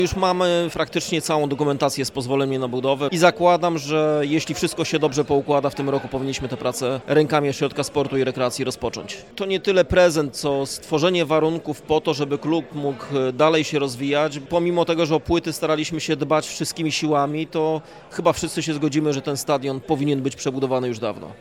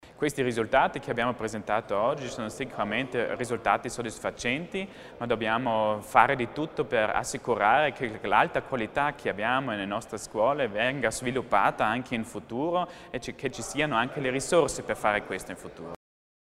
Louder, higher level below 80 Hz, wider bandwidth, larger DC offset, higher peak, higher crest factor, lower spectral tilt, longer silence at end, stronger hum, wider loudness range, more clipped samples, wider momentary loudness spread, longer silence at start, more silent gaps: first, -21 LUFS vs -28 LUFS; first, -48 dBFS vs -56 dBFS; about the same, 17 kHz vs 16 kHz; neither; about the same, -2 dBFS vs -4 dBFS; second, 18 dB vs 26 dB; about the same, -5 dB/octave vs -4.5 dB/octave; second, 0.05 s vs 0.65 s; neither; about the same, 3 LU vs 4 LU; neither; second, 7 LU vs 11 LU; about the same, 0 s vs 0.05 s; neither